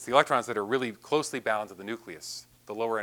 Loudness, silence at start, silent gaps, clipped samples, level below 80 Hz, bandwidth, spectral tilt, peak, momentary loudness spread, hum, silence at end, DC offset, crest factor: -30 LUFS; 0 s; none; under 0.1%; -72 dBFS; 19.5 kHz; -3.5 dB/octave; -4 dBFS; 15 LU; 60 Hz at -60 dBFS; 0 s; under 0.1%; 26 dB